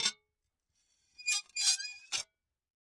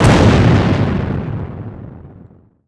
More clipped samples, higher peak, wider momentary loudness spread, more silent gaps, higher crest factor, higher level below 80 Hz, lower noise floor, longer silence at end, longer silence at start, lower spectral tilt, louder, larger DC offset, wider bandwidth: second, under 0.1% vs 0.1%; second, -14 dBFS vs 0 dBFS; second, 9 LU vs 22 LU; neither; first, 24 dB vs 14 dB; second, -82 dBFS vs -26 dBFS; first, -85 dBFS vs -43 dBFS; about the same, 0.6 s vs 0.6 s; about the same, 0 s vs 0 s; second, 3.5 dB/octave vs -7 dB/octave; second, -32 LUFS vs -14 LUFS; neither; about the same, 11.5 kHz vs 11 kHz